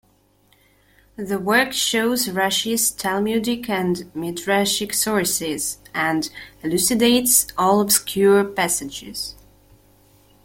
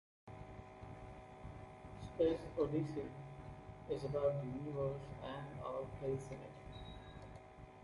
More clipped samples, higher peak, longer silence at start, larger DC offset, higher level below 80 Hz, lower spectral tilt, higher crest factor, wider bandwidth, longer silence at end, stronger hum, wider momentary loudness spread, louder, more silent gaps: neither; first, -2 dBFS vs -24 dBFS; first, 1.2 s vs 0.25 s; neither; first, -54 dBFS vs -60 dBFS; second, -2.5 dB/octave vs -8 dB/octave; about the same, 18 dB vs 20 dB; first, 16.5 kHz vs 11.5 kHz; first, 1.1 s vs 0 s; neither; second, 12 LU vs 17 LU; first, -19 LUFS vs -43 LUFS; neither